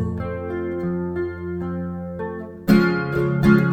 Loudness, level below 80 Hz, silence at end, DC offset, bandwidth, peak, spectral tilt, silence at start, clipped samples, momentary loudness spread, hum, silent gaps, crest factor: -22 LUFS; -42 dBFS; 0 s; under 0.1%; 18.5 kHz; -2 dBFS; -8.5 dB/octave; 0 s; under 0.1%; 13 LU; none; none; 18 dB